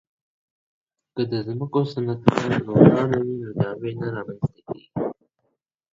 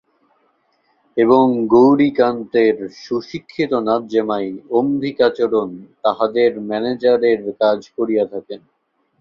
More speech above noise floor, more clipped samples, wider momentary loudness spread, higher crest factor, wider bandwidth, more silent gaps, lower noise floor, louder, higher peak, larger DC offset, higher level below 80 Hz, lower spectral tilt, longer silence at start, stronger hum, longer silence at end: first, 53 dB vs 46 dB; neither; about the same, 14 LU vs 12 LU; first, 24 dB vs 16 dB; first, 7.8 kHz vs 7 kHz; neither; first, -75 dBFS vs -62 dBFS; second, -23 LUFS vs -17 LUFS; about the same, 0 dBFS vs -2 dBFS; neither; first, -54 dBFS vs -60 dBFS; first, -8.5 dB/octave vs -7 dB/octave; about the same, 1.15 s vs 1.15 s; neither; first, 0.8 s vs 0.65 s